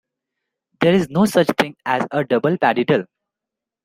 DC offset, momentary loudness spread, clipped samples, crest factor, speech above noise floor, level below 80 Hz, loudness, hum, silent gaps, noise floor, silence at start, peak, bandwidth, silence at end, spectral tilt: under 0.1%; 5 LU; under 0.1%; 18 dB; 68 dB; -58 dBFS; -18 LUFS; none; none; -85 dBFS; 0.8 s; -2 dBFS; 16 kHz; 0.8 s; -6 dB/octave